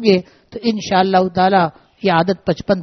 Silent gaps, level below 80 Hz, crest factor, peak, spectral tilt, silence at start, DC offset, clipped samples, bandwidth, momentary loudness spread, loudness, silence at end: none; -50 dBFS; 16 dB; 0 dBFS; -4.5 dB/octave; 0 s; under 0.1%; under 0.1%; 6.4 kHz; 8 LU; -16 LUFS; 0 s